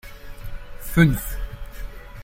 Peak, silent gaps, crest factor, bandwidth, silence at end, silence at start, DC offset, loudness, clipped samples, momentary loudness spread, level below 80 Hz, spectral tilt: -2 dBFS; none; 22 dB; 16.5 kHz; 0 s; 0.05 s; under 0.1%; -21 LUFS; under 0.1%; 22 LU; -32 dBFS; -6.5 dB/octave